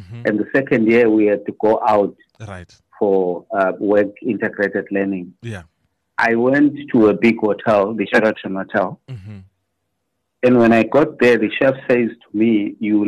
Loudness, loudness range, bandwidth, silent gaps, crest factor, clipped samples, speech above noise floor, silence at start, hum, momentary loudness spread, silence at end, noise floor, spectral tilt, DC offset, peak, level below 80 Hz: -17 LUFS; 4 LU; 9.8 kHz; none; 12 dB; under 0.1%; 57 dB; 0 s; none; 15 LU; 0 s; -74 dBFS; -7.5 dB/octave; under 0.1%; -4 dBFS; -58 dBFS